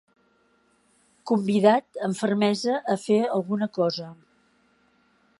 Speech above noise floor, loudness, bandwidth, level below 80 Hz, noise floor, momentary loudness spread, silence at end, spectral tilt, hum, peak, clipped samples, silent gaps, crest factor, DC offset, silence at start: 41 dB; -24 LUFS; 11.5 kHz; -74 dBFS; -65 dBFS; 10 LU; 1.25 s; -6 dB/octave; none; -4 dBFS; under 0.1%; none; 22 dB; under 0.1%; 1.25 s